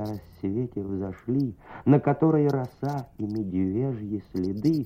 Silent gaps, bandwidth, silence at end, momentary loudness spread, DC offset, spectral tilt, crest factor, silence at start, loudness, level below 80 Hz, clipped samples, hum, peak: none; 15 kHz; 0 s; 11 LU; under 0.1%; -10 dB/octave; 18 dB; 0 s; -27 LUFS; -56 dBFS; under 0.1%; none; -8 dBFS